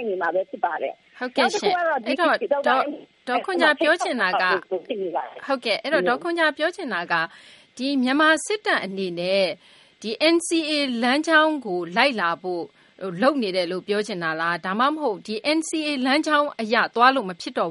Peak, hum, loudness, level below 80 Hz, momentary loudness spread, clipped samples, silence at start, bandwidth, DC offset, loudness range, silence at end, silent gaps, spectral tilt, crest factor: -2 dBFS; none; -22 LUFS; -76 dBFS; 11 LU; under 0.1%; 0 s; 11.5 kHz; under 0.1%; 3 LU; 0 s; none; -3.5 dB/octave; 20 dB